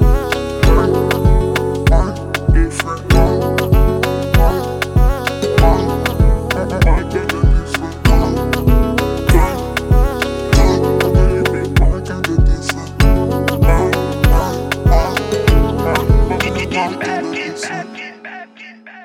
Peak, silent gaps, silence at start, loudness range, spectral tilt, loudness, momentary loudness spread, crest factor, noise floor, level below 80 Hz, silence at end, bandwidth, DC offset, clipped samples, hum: 0 dBFS; none; 0 s; 1 LU; -6 dB/octave; -15 LUFS; 7 LU; 14 dB; -37 dBFS; -16 dBFS; 0 s; 16 kHz; under 0.1%; under 0.1%; none